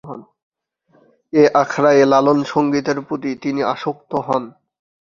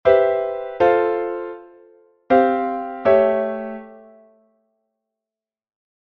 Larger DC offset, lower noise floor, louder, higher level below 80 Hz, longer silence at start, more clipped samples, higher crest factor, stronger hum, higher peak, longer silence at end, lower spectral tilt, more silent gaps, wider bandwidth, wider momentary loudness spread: neither; second, -59 dBFS vs -89 dBFS; about the same, -17 LUFS vs -19 LUFS; about the same, -60 dBFS vs -56 dBFS; about the same, 0.05 s vs 0.05 s; neither; about the same, 18 dB vs 20 dB; neither; about the same, 0 dBFS vs -2 dBFS; second, 0.6 s vs 2.1 s; second, -6 dB/octave vs -7.5 dB/octave; first, 0.43-0.52 s vs none; first, 7.4 kHz vs 5.6 kHz; second, 12 LU vs 16 LU